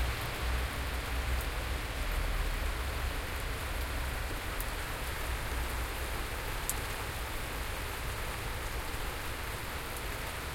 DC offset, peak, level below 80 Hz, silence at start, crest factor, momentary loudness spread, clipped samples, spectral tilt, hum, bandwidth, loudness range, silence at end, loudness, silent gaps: under 0.1%; -10 dBFS; -38 dBFS; 0 s; 26 dB; 3 LU; under 0.1%; -3.5 dB/octave; none; 16.5 kHz; 2 LU; 0 s; -37 LUFS; none